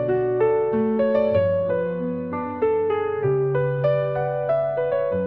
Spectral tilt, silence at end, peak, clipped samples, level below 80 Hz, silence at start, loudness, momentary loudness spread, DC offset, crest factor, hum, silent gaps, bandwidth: -11 dB/octave; 0 s; -8 dBFS; under 0.1%; -58 dBFS; 0 s; -22 LUFS; 5 LU; 0.2%; 12 dB; none; none; 5 kHz